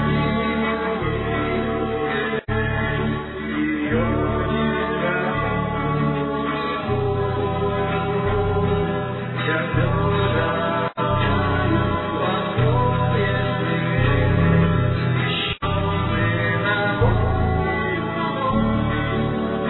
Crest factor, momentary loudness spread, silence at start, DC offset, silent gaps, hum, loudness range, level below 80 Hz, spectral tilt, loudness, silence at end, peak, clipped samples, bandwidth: 14 dB; 4 LU; 0 s; under 0.1%; none; none; 3 LU; -34 dBFS; -10.5 dB/octave; -21 LUFS; 0 s; -6 dBFS; under 0.1%; 4.3 kHz